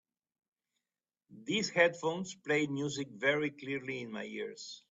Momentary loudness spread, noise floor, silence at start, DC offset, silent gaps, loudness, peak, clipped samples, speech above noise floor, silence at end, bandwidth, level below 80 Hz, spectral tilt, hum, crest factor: 13 LU; under -90 dBFS; 1.3 s; under 0.1%; none; -34 LUFS; -12 dBFS; under 0.1%; over 55 dB; 0.15 s; 8 kHz; -78 dBFS; -4 dB/octave; none; 24 dB